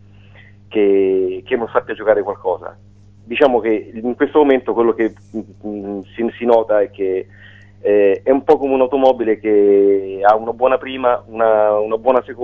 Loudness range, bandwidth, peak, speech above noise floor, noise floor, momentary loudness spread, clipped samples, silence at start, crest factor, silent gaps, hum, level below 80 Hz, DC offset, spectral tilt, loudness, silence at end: 4 LU; 4.8 kHz; 0 dBFS; 28 dB; -43 dBFS; 11 LU; under 0.1%; 0.7 s; 16 dB; none; none; -54 dBFS; 0.2%; -7.5 dB/octave; -16 LUFS; 0 s